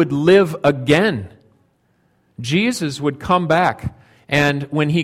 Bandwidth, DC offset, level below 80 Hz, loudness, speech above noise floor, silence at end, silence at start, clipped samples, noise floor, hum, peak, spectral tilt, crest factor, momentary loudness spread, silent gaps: 15.5 kHz; under 0.1%; -48 dBFS; -17 LUFS; 45 dB; 0 s; 0 s; under 0.1%; -61 dBFS; none; 0 dBFS; -6 dB/octave; 18 dB; 16 LU; none